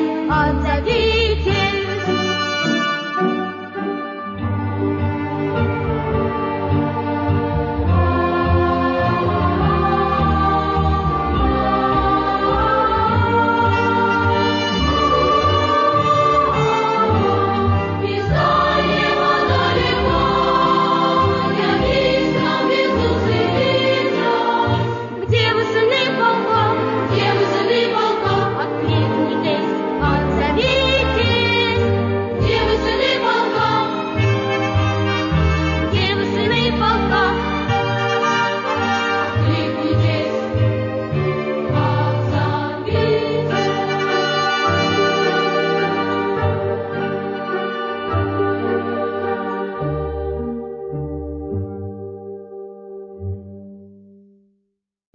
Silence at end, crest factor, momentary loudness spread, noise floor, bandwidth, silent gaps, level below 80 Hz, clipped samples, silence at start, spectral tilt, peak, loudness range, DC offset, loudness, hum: 1.25 s; 14 dB; 8 LU; -72 dBFS; 7.4 kHz; none; -32 dBFS; under 0.1%; 0 s; -6.5 dB/octave; -4 dBFS; 6 LU; under 0.1%; -18 LUFS; none